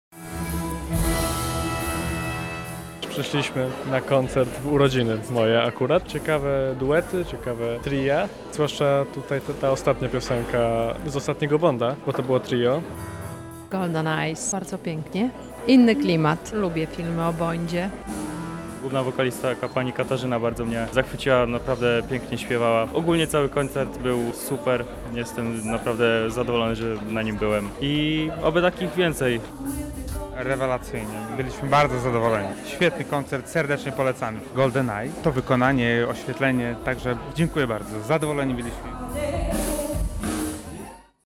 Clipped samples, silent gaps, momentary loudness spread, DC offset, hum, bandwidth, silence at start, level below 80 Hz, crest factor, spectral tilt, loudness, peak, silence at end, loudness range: under 0.1%; none; 10 LU; under 0.1%; none; 16.5 kHz; 0.1 s; -40 dBFS; 20 dB; -5.5 dB/octave; -24 LUFS; -4 dBFS; 0.25 s; 4 LU